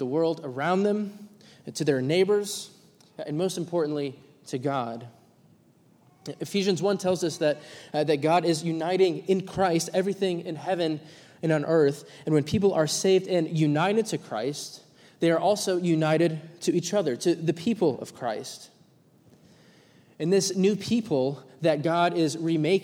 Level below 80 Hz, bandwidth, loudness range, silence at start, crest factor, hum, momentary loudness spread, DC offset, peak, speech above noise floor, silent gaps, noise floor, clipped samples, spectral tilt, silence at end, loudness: -66 dBFS; 16.5 kHz; 6 LU; 0 s; 16 dB; none; 12 LU; under 0.1%; -10 dBFS; 34 dB; none; -60 dBFS; under 0.1%; -5.5 dB/octave; 0 s; -26 LUFS